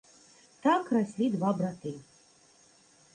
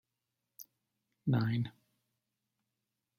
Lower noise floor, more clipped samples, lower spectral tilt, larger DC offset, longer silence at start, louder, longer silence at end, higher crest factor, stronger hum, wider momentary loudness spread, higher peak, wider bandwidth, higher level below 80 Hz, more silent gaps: second, -61 dBFS vs -87 dBFS; neither; about the same, -7 dB/octave vs -7.5 dB/octave; neither; about the same, 0.65 s vs 0.6 s; first, -30 LUFS vs -35 LUFS; second, 1.15 s vs 1.5 s; about the same, 18 dB vs 20 dB; neither; second, 14 LU vs 22 LU; first, -14 dBFS vs -20 dBFS; second, 10 kHz vs 16 kHz; about the same, -74 dBFS vs -76 dBFS; neither